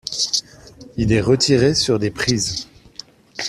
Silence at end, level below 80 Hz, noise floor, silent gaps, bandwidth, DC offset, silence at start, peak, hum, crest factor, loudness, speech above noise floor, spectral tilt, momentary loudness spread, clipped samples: 0 s; -42 dBFS; -42 dBFS; none; 14.5 kHz; under 0.1%; 0.05 s; -2 dBFS; none; 18 dB; -18 LUFS; 25 dB; -4 dB/octave; 21 LU; under 0.1%